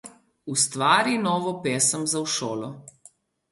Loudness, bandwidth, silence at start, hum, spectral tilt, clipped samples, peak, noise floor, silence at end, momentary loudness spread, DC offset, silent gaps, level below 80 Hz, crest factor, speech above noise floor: -23 LUFS; 12 kHz; 0.05 s; none; -2.5 dB/octave; under 0.1%; -4 dBFS; -56 dBFS; 0.7 s; 16 LU; under 0.1%; none; -70 dBFS; 20 dB; 32 dB